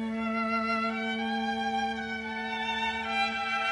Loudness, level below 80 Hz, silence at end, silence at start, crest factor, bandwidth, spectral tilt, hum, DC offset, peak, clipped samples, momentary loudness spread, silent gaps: -30 LUFS; -60 dBFS; 0 s; 0 s; 14 dB; 10.5 kHz; -4 dB/octave; none; under 0.1%; -18 dBFS; under 0.1%; 5 LU; none